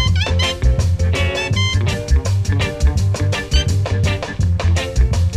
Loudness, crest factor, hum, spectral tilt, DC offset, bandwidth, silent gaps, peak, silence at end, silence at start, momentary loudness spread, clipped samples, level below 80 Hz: -17 LUFS; 14 dB; none; -5 dB/octave; under 0.1%; 12 kHz; none; -2 dBFS; 0 s; 0 s; 2 LU; under 0.1%; -20 dBFS